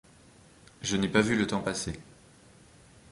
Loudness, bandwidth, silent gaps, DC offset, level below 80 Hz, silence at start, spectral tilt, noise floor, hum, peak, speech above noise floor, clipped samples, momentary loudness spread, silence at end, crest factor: -29 LUFS; 11.5 kHz; none; under 0.1%; -54 dBFS; 0.8 s; -4.5 dB/octave; -56 dBFS; none; -8 dBFS; 28 dB; under 0.1%; 12 LU; 1.1 s; 24 dB